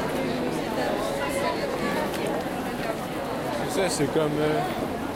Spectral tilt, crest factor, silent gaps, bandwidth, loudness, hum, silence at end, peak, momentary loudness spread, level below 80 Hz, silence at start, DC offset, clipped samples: -5 dB/octave; 16 dB; none; 16.5 kHz; -27 LUFS; none; 0 s; -12 dBFS; 5 LU; -48 dBFS; 0 s; under 0.1%; under 0.1%